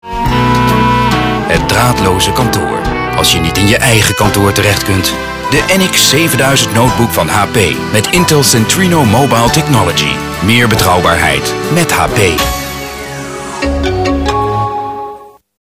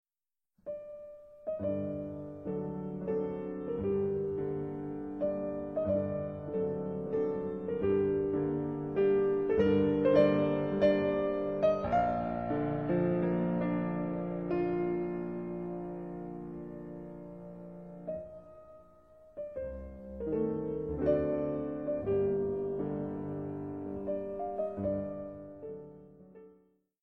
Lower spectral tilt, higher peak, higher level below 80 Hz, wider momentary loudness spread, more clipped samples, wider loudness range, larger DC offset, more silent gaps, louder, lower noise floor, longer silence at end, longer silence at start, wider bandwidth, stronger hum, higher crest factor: second, -4 dB/octave vs -10 dB/octave; first, 0 dBFS vs -14 dBFS; first, -26 dBFS vs -56 dBFS; second, 9 LU vs 17 LU; first, 0.3% vs under 0.1%; second, 4 LU vs 13 LU; neither; neither; first, -10 LUFS vs -33 LUFS; second, -31 dBFS vs under -90 dBFS; about the same, 0.4 s vs 0.5 s; second, 0.05 s vs 0.65 s; first, 19 kHz vs 6 kHz; neither; second, 10 dB vs 20 dB